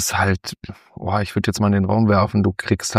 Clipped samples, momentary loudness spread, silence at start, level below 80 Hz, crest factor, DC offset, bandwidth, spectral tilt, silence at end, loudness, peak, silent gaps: under 0.1%; 15 LU; 0 s; -46 dBFS; 18 dB; under 0.1%; 15.5 kHz; -5.5 dB/octave; 0 s; -19 LUFS; -2 dBFS; none